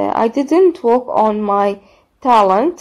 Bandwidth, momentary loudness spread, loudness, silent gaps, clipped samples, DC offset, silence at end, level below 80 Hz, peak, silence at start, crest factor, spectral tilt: 11 kHz; 7 LU; -14 LUFS; none; under 0.1%; under 0.1%; 0.05 s; -56 dBFS; 0 dBFS; 0 s; 14 dB; -6.5 dB/octave